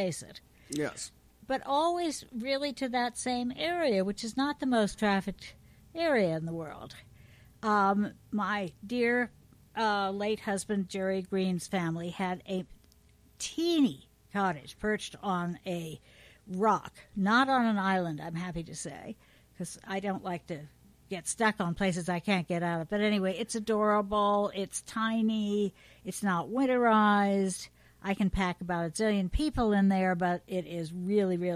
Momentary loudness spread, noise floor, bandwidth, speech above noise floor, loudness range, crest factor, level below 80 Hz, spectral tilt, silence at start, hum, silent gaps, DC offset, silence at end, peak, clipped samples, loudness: 14 LU; -61 dBFS; 15 kHz; 31 dB; 5 LU; 18 dB; -52 dBFS; -5 dB/octave; 0 s; none; none; under 0.1%; 0 s; -14 dBFS; under 0.1%; -31 LUFS